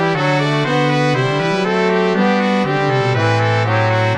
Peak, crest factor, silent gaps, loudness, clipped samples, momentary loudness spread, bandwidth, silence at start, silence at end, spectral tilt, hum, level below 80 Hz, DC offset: -2 dBFS; 12 dB; none; -15 LUFS; under 0.1%; 1 LU; 10 kHz; 0 s; 0 s; -6.5 dB/octave; none; -56 dBFS; 0.3%